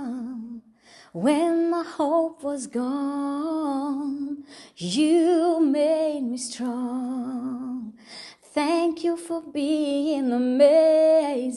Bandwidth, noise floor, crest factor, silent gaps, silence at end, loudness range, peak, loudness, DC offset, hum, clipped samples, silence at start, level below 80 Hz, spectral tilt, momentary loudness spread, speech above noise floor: 11.5 kHz; -53 dBFS; 16 dB; none; 0 s; 6 LU; -6 dBFS; -24 LUFS; under 0.1%; none; under 0.1%; 0 s; -72 dBFS; -5 dB/octave; 16 LU; 30 dB